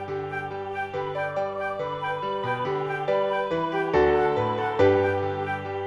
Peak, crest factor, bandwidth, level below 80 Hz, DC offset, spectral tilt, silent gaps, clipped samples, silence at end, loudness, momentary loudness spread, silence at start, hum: -8 dBFS; 16 dB; 7.4 kHz; -52 dBFS; under 0.1%; -7 dB/octave; none; under 0.1%; 0 s; -26 LUFS; 10 LU; 0 s; none